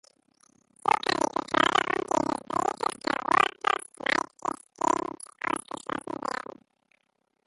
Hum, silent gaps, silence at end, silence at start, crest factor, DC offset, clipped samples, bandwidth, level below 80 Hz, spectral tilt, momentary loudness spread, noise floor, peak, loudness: none; none; 1.1 s; 0.85 s; 22 dB; under 0.1%; under 0.1%; 12 kHz; -64 dBFS; -2.5 dB/octave; 12 LU; -75 dBFS; -8 dBFS; -28 LUFS